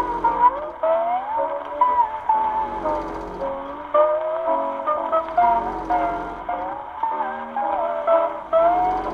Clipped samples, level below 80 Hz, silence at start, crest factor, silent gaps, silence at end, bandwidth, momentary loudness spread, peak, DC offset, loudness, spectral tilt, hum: under 0.1%; -48 dBFS; 0 s; 16 dB; none; 0 s; 6.6 kHz; 9 LU; -4 dBFS; under 0.1%; -22 LUFS; -6.5 dB/octave; none